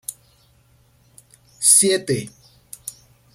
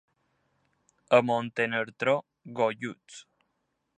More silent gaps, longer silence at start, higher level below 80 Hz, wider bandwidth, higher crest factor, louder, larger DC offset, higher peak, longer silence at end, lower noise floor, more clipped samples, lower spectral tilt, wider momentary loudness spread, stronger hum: neither; second, 0.1 s vs 1.1 s; first, -62 dBFS vs -78 dBFS; first, 16.5 kHz vs 9.6 kHz; about the same, 24 dB vs 24 dB; first, -15 LUFS vs -28 LUFS; neither; first, 0 dBFS vs -6 dBFS; second, 0.45 s vs 0.75 s; second, -57 dBFS vs -78 dBFS; neither; second, -2 dB/octave vs -5.5 dB/octave; about the same, 23 LU vs 22 LU; neither